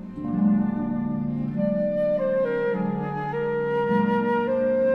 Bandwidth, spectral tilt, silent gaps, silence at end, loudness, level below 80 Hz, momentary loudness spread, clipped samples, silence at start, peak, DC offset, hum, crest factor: 5 kHz; -10 dB/octave; none; 0 s; -24 LUFS; -52 dBFS; 5 LU; under 0.1%; 0 s; -10 dBFS; under 0.1%; none; 14 dB